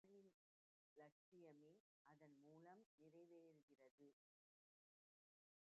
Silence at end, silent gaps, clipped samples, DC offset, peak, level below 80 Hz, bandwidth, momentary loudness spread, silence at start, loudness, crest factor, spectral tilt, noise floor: 1.65 s; 0.34-0.96 s, 1.12-1.32 s, 1.80-2.05 s, 2.86-2.98 s, 3.63-3.68 s, 3.91-3.98 s; under 0.1%; under 0.1%; -54 dBFS; under -90 dBFS; 4.3 kHz; 1 LU; 0.05 s; -69 LUFS; 18 dB; -6.5 dB/octave; under -90 dBFS